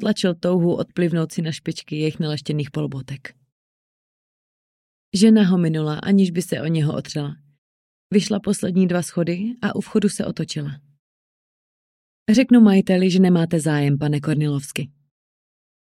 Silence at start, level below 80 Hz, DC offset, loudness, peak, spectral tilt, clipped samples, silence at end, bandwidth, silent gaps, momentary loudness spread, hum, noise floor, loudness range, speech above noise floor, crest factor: 0 s; -60 dBFS; under 0.1%; -20 LUFS; -4 dBFS; -6.5 dB/octave; under 0.1%; 1.1 s; 13 kHz; 3.52-5.12 s, 7.58-8.10 s, 10.99-12.26 s; 14 LU; none; under -90 dBFS; 8 LU; over 71 dB; 16 dB